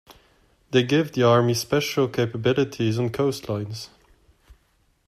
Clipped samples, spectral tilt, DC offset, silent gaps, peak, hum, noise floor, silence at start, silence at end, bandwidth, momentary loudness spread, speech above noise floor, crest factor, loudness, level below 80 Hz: under 0.1%; -5.5 dB/octave; under 0.1%; none; -6 dBFS; none; -65 dBFS; 0.1 s; 1.2 s; 15 kHz; 11 LU; 43 dB; 18 dB; -22 LUFS; -56 dBFS